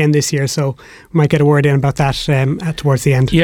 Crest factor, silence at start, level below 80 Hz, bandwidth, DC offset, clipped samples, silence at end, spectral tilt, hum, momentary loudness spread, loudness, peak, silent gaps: 12 dB; 0 s; -36 dBFS; 16 kHz; under 0.1%; under 0.1%; 0 s; -6 dB/octave; none; 8 LU; -15 LUFS; -2 dBFS; none